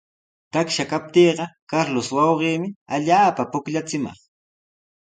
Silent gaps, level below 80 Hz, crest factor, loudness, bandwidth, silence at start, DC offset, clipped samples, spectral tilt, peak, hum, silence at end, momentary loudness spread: 1.62-1.67 s, 2.76-2.86 s; -64 dBFS; 18 dB; -21 LUFS; 9.4 kHz; 0.55 s; under 0.1%; under 0.1%; -5 dB/octave; -4 dBFS; none; 1 s; 10 LU